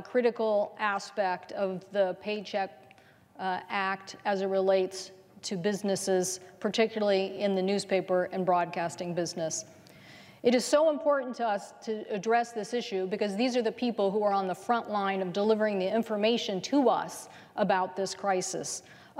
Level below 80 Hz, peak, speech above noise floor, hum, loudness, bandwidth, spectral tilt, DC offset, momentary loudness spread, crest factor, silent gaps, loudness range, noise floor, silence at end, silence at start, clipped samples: -80 dBFS; -12 dBFS; 29 dB; none; -30 LUFS; 16 kHz; -4 dB/octave; under 0.1%; 9 LU; 18 dB; none; 3 LU; -58 dBFS; 0 s; 0 s; under 0.1%